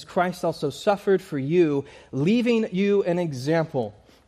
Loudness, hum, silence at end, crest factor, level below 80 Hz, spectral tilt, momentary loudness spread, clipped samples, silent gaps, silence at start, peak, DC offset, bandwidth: -24 LUFS; none; 0.35 s; 16 dB; -62 dBFS; -7 dB/octave; 7 LU; under 0.1%; none; 0 s; -8 dBFS; under 0.1%; 14.5 kHz